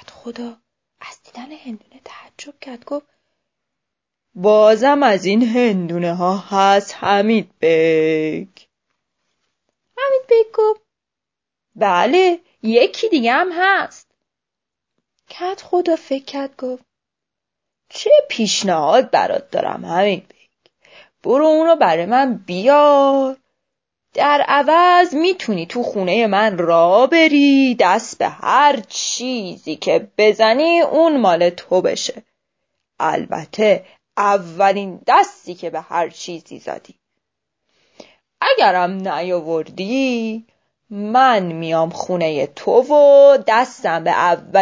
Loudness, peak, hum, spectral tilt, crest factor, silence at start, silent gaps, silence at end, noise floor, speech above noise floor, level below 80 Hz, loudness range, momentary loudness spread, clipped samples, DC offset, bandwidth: -15 LUFS; 0 dBFS; none; -4.5 dB/octave; 16 dB; 0.25 s; none; 0 s; -84 dBFS; 69 dB; -70 dBFS; 8 LU; 17 LU; under 0.1%; under 0.1%; 7.8 kHz